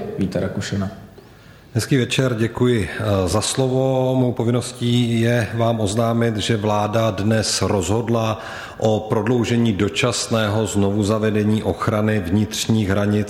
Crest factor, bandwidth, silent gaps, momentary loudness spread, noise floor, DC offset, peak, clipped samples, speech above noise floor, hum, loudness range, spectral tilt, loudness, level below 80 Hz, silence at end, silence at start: 14 dB; 15.5 kHz; none; 5 LU; -44 dBFS; under 0.1%; -4 dBFS; under 0.1%; 26 dB; none; 1 LU; -5.5 dB/octave; -19 LUFS; -46 dBFS; 0 s; 0 s